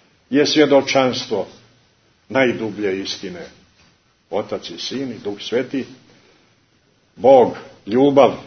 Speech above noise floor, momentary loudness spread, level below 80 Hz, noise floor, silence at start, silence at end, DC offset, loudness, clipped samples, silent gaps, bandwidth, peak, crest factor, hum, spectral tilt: 42 dB; 15 LU; -62 dBFS; -59 dBFS; 0.3 s; 0 s; under 0.1%; -18 LUFS; under 0.1%; none; 6.6 kHz; 0 dBFS; 20 dB; none; -4.5 dB/octave